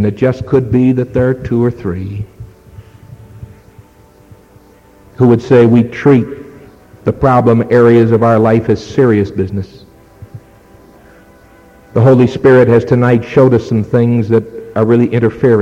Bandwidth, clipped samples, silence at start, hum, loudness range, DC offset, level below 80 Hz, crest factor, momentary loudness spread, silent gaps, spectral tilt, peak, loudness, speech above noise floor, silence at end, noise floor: 7.4 kHz; under 0.1%; 0 s; none; 9 LU; under 0.1%; -40 dBFS; 12 dB; 12 LU; none; -9 dB/octave; 0 dBFS; -11 LUFS; 33 dB; 0 s; -43 dBFS